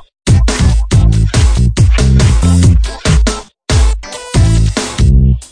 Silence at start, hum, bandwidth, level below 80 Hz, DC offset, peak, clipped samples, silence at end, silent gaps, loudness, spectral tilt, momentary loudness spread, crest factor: 0.25 s; none; 10.5 kHz; -12 dBFS; 0.8%; 0 dBFS; under 0.1%; 0.05 s; none; -11 LUFS; -5.5 dB/octave; 6 LU; 10 dB